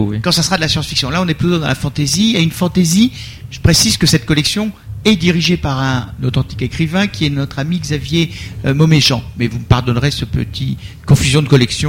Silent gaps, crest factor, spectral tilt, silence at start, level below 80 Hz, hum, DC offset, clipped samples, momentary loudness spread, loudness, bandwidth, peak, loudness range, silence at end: none; 14 dB; -4.5 dB/octave; 0 s; -32 dBFS; none; under 0.1%; under 0.1%; 9 LU; -14 LUFS; 17 kHz; 0 dBFS; 3 LU; 0 s